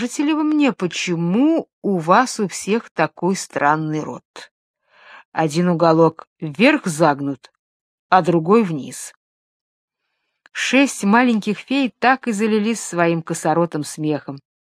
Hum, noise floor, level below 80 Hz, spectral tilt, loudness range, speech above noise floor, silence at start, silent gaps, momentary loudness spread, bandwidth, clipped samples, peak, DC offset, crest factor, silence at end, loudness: none; -74 dBFS; -70 dBFS; -5 dB/octave; 4 LU; 56 dB; 0 s; 1.73-1.82 s, 2.91-2.95 s, 4.25-4.34 s, 4.51-4.74 s, 5.25-5.32 s, 6.27-6.36 s, 7.59-8.09 s, 9.17-9.88 s; 12 LU; 14.5 kHz; under 0.1%; 0 dBFS; under 0.1%; 18 dB; 0.35 s; -18 LUFS